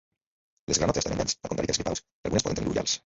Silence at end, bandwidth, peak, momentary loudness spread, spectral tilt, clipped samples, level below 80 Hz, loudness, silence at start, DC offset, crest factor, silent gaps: 0.05 s; 8.2 kHz; -8 dBFS; 7 LU; -3.5 dB/octave; under 0.1%; -46 dBFS; -28 LUFS; 0.7 s; under 0.1%; 22 dB; 2.12-2.23 s